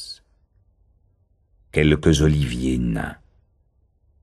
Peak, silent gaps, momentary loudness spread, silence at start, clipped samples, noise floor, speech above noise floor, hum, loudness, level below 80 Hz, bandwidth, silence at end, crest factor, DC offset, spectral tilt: -2 dBFS; none; 17 LU; 0 s; under 0.1%; -63 dBFS; 44 dB; none; -20 LUFS; -34 dBFS; 12.5 kHz; 1.1 s; 22 dB; under 0.1%; -6 dB/octave